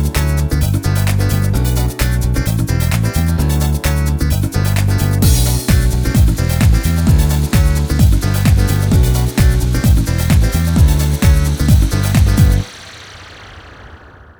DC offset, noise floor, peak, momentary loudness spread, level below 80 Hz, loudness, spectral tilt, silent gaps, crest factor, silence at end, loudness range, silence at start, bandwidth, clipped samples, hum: under 0.1%; -38 dBFS; 0 dBFS; 4 LU; -16 dBFS; -14 LUFS; -5.5 dB/octave; none; 12 dB; 0.45 s; 2 LU; 0 s; over 20 kHz; under 0.1%; none